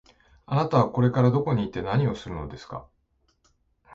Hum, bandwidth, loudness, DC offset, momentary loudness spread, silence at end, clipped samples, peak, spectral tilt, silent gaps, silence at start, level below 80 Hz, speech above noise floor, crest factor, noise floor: none; 7.2 kHz; -24 LUFS; under 0.1%; 17 LU; 0 s; under 0.1%; -6 dBFS; -8.5 dB/octave; none; 0.5 s; -50 dBFS; 45 dB; 20 dB; -69 dBFS